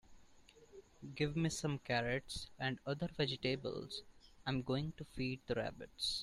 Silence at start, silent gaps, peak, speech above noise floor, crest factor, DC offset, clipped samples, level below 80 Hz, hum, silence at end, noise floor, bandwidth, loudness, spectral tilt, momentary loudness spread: 0.1 s; none; -24 dBFS; 23 dB; 18 dB; under 0.1%; under 0.1%; -62 dBFS; none; 0 s; -64 dBFS; 13.5 kHz; -41 LUFS; -5 dB/octave; 11 LU